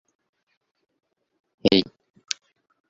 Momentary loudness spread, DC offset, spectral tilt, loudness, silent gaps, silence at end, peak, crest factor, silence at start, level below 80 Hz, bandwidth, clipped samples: 13 LU; under 0.1%; -3.5 dB/octave; -24 LUFS; none; 1.05 s; -2 dBFS; 28 dB; 1.65 s; -60 dBFS; 7.6 kHz; under 0.1%